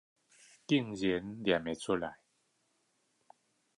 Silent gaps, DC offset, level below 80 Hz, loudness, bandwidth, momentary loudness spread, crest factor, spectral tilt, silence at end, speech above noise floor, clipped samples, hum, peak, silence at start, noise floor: none; under 0.1%; -66 dBFS; -34 LUFS; 11 kHz; 6 LU; 22 dB; -5.5 dB/octave; 1.65 s; 44 dB; under 0.1%; none; -16 dBFS; 0.7 s; -77 dBFS